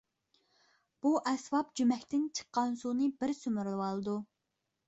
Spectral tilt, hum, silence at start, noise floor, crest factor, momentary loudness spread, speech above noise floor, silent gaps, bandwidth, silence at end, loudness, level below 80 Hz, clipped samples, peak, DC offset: -5 dB/octave; none; 1.05 s; -85 dBFS; 16 dB; 6 LU; 52 dB; none; 8.2 kHz; 0.65 s; -34 LUFS; -76 dBFS; under 0.1%; -18 dBFS; under 0.1%